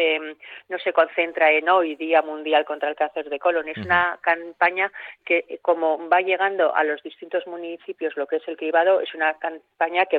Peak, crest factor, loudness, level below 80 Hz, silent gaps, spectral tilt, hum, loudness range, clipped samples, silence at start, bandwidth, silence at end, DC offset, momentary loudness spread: -6 dBFS; 18 dB; -22 LUFS; -70 dBFS; none; -7 dB/octave; none; 2 LU; under 0.1%; 0 s; 4.7 kHz; 0 s; under 0.1%; 11 LU